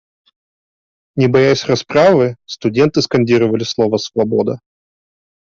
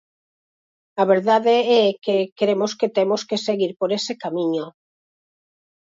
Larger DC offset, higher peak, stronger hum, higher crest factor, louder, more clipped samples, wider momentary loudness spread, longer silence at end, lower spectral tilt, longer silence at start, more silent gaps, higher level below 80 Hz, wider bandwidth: neither; about the same, -2 dBFS vs -4 dBFS; neither; about the same, 14 dB vs 16 dB; first, -14 LUFS vs -20 LUFS; neither; about the same, 8 LU vs 8 LU; second, 0.85 s vs 1.25 s; about the same, -6 dB/octave vs -5 dB/octave; first, 1.15 s vs 0.95 s; second, none vs 2.32-2.36 s, 3.76-3.80 s; first, -52 dBFS vs -74 dBFS; about the same, 7.4 kHz vs 7.8 kHz